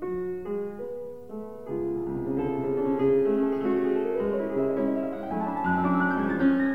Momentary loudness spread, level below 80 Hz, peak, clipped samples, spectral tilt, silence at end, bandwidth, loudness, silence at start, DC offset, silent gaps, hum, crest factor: 12 LU; -58 dBFS; -12 dBFS; under 0.1%; -9.5 dB/octave; 0 s; 4.5 kHz; -27 LUFS; 0 s; 0.4%; none; none; 14 dB